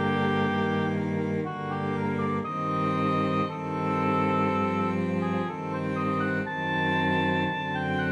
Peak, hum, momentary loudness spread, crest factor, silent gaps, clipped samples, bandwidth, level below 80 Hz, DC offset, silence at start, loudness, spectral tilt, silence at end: -14 dBFS; none; 5 LU; 14 dB; none; under 0.1%; 9.8 kHz; -64 dBFS; under 0.1%; 0 s; -27 LUFS; -7.5 dB/octave; 0 s